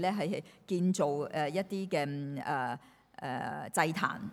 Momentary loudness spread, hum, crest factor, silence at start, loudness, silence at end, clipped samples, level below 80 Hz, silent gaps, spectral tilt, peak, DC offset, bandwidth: 9 LU; none; 20 dB; 0 s; -34 LUFS; 0 s; under 0.1%; -76 dBFS; none; -5.5 dB/octave; -12 dBFS; under 0.1%; 16 kHz